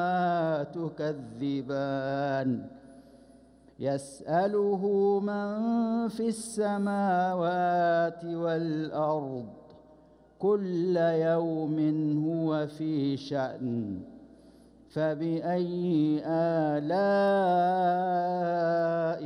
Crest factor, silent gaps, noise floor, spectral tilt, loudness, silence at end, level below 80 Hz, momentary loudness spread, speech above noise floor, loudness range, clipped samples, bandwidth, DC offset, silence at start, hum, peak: 12 dB; none; -57 dBFS; -7 dB/octave; -29 LUFS; 0 s; -68 dBFS; 8 LU; 29 dB; 6 LU; under 0.1%; 11.5 kHz; under 0.1%; 0 s; none; -16 dBFS